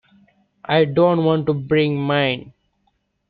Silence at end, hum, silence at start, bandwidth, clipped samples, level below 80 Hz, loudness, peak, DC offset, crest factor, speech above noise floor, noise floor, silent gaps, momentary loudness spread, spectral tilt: 0.8 s; none; 0.7 s; 4.9 kHz; under 0.1%; -56 dBFS; -18 LUFS; -4 dBFS; under 0.1%; 16 dB; 50 dB; -68 dBFS; none; 6 LU; -11 dB/octave